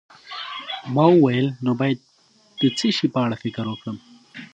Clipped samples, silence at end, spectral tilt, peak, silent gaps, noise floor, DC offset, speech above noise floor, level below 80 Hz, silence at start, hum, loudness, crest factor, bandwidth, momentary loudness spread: under 0.1%; 0.1 s; -6.5 dB/octave; -2 dBFS; none; -56 dBFS; under 0.1%; 37 dB; -66 dBFS; 0.25 s; none; -21 LUFS; 20 dB; 9 kHz; 20 LU